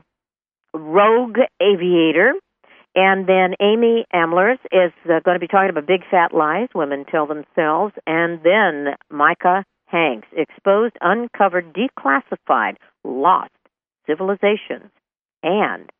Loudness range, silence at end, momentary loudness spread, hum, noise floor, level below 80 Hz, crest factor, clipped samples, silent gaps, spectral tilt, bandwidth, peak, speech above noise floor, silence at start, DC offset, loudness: 4 LU; 0.15 s; 10 LU; none; -89 dBFS; -72 dBFS; 16 dB; under 0.1%; 15.21-15.25 s; -9.5 dB/octave; 3.7 kHz; -2 dBFS; 72 dB; 0.75 s; under 0.1%; -17 LUFS